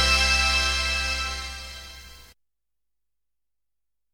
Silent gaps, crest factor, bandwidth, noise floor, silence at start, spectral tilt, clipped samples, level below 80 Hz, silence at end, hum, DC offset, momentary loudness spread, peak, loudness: none; 18 dB; 19 kHz; -89 dBFS; 0 s; -1.5 dB/octave; under 0.1%; -36 dBFS; 1.9 s; none; under 0.1%; 22 LU; -10 dBFS; -22 LUFS